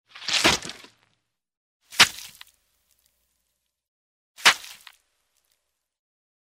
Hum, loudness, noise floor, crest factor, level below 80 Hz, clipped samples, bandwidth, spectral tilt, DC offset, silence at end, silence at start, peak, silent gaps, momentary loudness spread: none; -20 LUFS; -77 dBFS; 26 dB; -58 dBFS; under 0.1%; 16 kHz; -0.5 dB/octave; under 0.1%; 1.85 s; 0.2 s; -2 dBFS; 1.57-1.80 s, 3.88-4.35 s; 22 LU